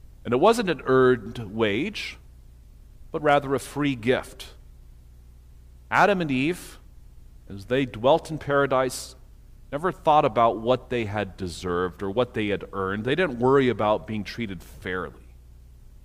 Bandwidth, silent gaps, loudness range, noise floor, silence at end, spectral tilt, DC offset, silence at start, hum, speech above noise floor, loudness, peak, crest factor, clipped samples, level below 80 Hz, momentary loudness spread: 15.5 kHz; none; 4 LU; -48 dBFS; 0.2 s; -5.5 dB/octave; under 0.1%; 0.25 s; 60 Hz at -50 dBFS; 24 dB; -24 LUFS; -6 dBFS; 20 dB; under 0.1%; -48 dBFS; 15 LU